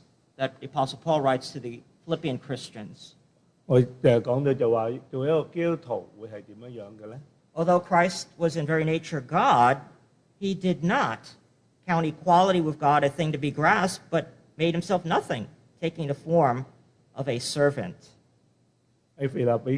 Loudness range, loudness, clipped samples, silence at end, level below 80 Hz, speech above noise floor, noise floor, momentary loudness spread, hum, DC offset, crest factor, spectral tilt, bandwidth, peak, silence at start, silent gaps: 5 LU; -25 LUFS; under 0.1%; 0 s; -64 dBFS; 41 dB; -67 dBFS; 20 LU; none; under 0.1%; 20 dB; -6 dB/octave; 11 kHz; -8 dBFS; 0.4 s; none